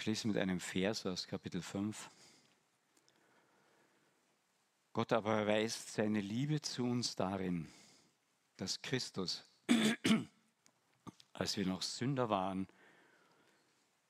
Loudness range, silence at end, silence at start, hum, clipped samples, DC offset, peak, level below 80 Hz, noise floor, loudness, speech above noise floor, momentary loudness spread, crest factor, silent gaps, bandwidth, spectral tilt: 9 LU; 1.45 s; 0 s; none; under 0.1%; under 0.1%; -18 dBFS; -78 dBFS; -78 dBFS; -38 LUFS; 41 dB; 12 LU; 22 dB; none; 15 kHz; -4.5 dB/octave